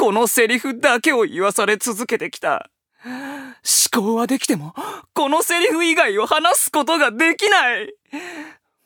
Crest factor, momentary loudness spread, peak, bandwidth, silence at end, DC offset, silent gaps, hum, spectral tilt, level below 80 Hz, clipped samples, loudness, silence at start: 18 dB; 16 LU; 0 dBFS; over 20 kHz; 0.35 s; under 0.1%; none; none; -2 dB/octave; -72 dBFS; under 0.1%; -17 LUFS; 0 s